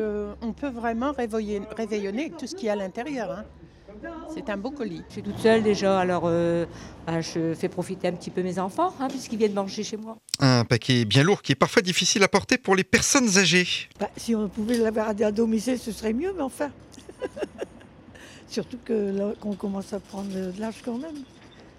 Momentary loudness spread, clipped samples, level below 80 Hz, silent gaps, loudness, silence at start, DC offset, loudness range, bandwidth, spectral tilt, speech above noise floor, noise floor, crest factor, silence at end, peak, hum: 15 LU; under 0.1%; -54 dBFS; none; -25 LUFS; 0 s; under 0.1%; 11 LU; 16 kHz; -4 dB/octave; 23 dB; -48 dBFS; 18 dB; 0.1 s; -6 dBFS; none